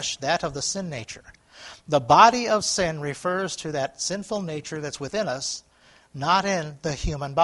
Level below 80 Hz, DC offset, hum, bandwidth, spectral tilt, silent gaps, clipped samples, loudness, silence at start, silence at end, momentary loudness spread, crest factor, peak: -46 dBFS; under 0.1%; none; 11.5 kHz; -3.5 dB/octave; none; under 0.1%; -24 LUFS; 0 s; 0 s; 18 LU; 24 dB; 0 dBFS